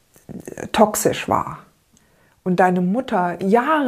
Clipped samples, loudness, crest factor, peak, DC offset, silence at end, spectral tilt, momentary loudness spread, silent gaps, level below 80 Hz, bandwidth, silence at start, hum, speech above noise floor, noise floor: under 0.1%; -19 LUFS; 20 dB; 0 dBFS; under 0.1%; 0 s; -5 dB/octave; 19 LU; none; -52 dBFS; 15.5 kHz; 0.3 s; none; 39 dB; -57 dBFS